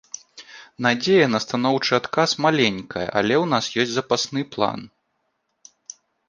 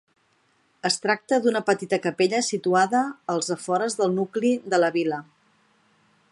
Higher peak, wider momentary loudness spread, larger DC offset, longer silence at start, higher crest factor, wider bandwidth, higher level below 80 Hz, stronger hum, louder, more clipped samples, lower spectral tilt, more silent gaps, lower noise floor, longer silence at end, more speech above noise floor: first, -2 dBFS vs -6 dBFS; first, 23 LU vs 5 LU; neither; second, 0.15 s vs 0.85 s; about the same, 20 dB vs 18 dB; second, 10 kHz vs 11.5 kHz; first, -60 dBFS vs -76 dBFS; neither; first, -21 LUFS vs -24 LUFS; neither; about the same, -4 dB/octave vs -4 dB/octave; neither; first, -73 dBFS vs -65 dBFS; first, 1.4 s vs 1.1 s; first, 52 dB vs 42 dB